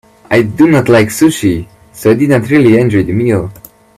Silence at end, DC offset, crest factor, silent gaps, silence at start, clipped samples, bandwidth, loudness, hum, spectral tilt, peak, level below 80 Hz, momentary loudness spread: 0.45 s; under 0.1%; 10 dB; none; 0.3 s; under 0.1%; 15 kHz; -10 LUFS; none; -6.5 dB/octave; 0 dBFS; -42 dBFS; 7 LU